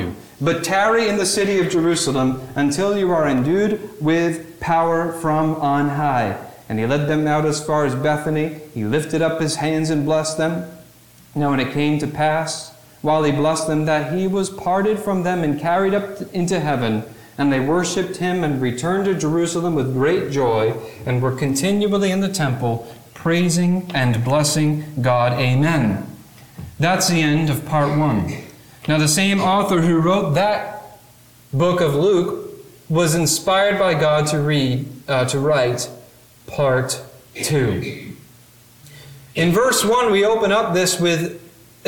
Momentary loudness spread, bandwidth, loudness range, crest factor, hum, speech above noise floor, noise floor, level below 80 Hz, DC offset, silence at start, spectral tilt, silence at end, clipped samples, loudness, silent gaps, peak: 10 LU; 19 kHz; 3 LU; 14 dB; none; 30 dB; -48 dBFS; -50 dBFS; 0.3%; 0 s; -5 dB/octave; 0.4 s; under 0.1%; -19 LUFS; none; -4 dBFS